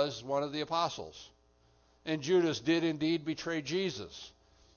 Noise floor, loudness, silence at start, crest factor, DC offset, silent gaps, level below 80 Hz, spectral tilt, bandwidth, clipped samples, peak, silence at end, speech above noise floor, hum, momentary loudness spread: -67 dBFS; -33 LUFS; 0 s; 18 dB; under 0.1%; none; -68 dBFS; -5 dB/octave; 7 kHz; under 0.1%; -16 dBFS; 0.45 s; 34 dB; none; 17 LU